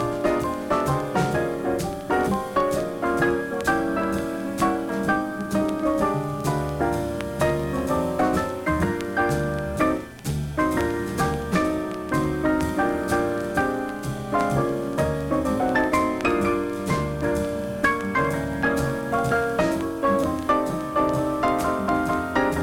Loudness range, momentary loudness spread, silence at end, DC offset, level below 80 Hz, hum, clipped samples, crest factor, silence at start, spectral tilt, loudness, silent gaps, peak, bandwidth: 1 LU; 4 LU; 0 s; under 0.1%; -40 dBFS; none; under 0.1%; 16 dB; 0 s; -6 dB/octave; -24 LUFS; none; -8 dBFS; 17.5 kHz